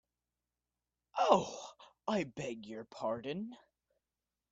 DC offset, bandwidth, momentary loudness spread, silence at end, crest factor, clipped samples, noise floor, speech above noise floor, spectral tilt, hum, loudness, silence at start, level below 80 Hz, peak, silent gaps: under 0.1%; 8 kHz; 18 LU; 0.95 s; 26 dB; under 0.1%; under -90 dBFS; over 51 dB; -5 dB/octave; 60 Hz at -70 dBFS; -36 LUFS; 1.15 s; -76 dBFS; -12 dBFS; none